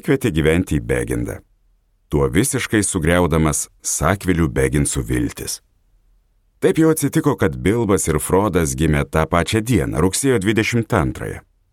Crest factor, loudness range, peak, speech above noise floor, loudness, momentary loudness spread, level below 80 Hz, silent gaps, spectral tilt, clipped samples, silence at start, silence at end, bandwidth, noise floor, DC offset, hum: 18 dB; 2 LU; 0 dBFS; 42 dB; -18 LUFS; 8 LU; -32 dBFS; none; -5 dB/octave; under 0.1%; 0.05 s; 0.35 s; 17 kHz; -59 dBFS; under 0.1%; none